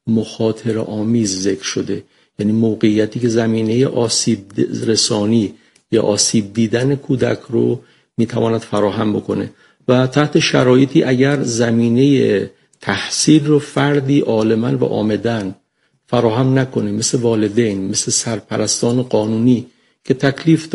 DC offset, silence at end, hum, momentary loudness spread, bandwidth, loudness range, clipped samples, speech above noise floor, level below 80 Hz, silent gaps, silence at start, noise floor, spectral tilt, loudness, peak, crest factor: under 0.1%; 0 s; none; 8 LU; 11.5 kHz; 3 LU; under 0.1%; 47 dB; -54 dBFS; none; 0.05 s; -62 dBFS; -5 dB/octave; -16 LUFS; 0 dBFS; 16 dB